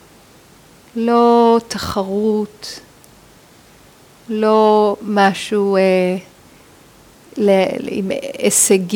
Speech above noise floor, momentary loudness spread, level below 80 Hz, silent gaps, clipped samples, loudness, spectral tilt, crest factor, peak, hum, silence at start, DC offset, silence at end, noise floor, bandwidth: 31 dB; 15 LU; -52 dBFS; none; under 0.1%; -15 LUFS; -4 dB/octave; 16 dB; 0 dBFS; none; 0.95 s; under 0.1%; 0 s; -46 dBFS; 19.5 kHz